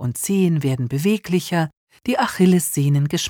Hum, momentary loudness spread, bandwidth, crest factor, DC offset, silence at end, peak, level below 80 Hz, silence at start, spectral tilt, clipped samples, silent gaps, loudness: none; 7 LU; 19.5 kHz; 14 dB; under 0.1%; 0 s; -6 dBFS; -56 dBFS; 0 s; -5.5 dB/octave; under 0.1%; 1.77-1.87 s; -19 LUFS